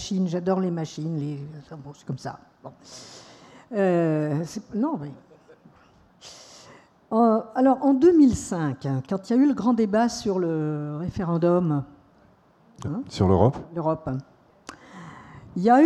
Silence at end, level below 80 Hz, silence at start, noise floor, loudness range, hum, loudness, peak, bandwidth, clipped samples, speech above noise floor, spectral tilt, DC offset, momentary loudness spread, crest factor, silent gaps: 0 s; -54 dBFS; 0 s; -57 dBFS; 9 LU; none; -24 LUFS; -4 dBFS; 11.5 kHz; under 0.1%; 35 dB; -7.5 dB/octave; under 0.1%; 23 LU; 20 dB; none